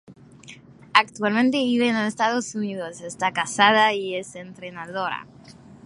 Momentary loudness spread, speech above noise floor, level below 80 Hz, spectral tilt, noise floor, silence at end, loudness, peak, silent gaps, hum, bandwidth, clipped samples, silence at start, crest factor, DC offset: 16 LU; 23 dB; -66 dBFS; -3.5 dB/octave; -46 dBFS; 0.1 s; -22 LUFS; 0 dBFS; none; none; 11.5 kHz; under 0.1%; 0.1 s; 24 dB; under 0.1%